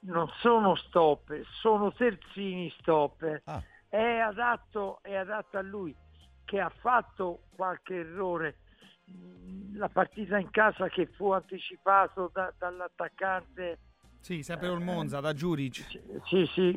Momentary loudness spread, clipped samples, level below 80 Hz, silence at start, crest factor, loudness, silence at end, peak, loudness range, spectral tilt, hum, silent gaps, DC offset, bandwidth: 15 LU; under 0.1%; -60 dBFS; 0.05 s; 20 dB; -30 LUFS; 0 s; -10 dBFS; 6 LU; -6.5 dB/octave; none; none; under 0.1%; 14 kHz